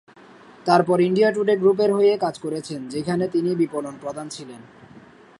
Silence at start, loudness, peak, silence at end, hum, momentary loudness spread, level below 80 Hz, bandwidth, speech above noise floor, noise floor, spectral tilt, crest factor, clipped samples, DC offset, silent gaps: 0.65 s; -21 LUFS; -2 dBFS; 0.4 s; none; 14 LU; -66 dBFS; 11.5 kHz; 27 dB; -47 dBFS; -6.5 dB/octave; 18 dB; under 0.1%; under 0.1%; none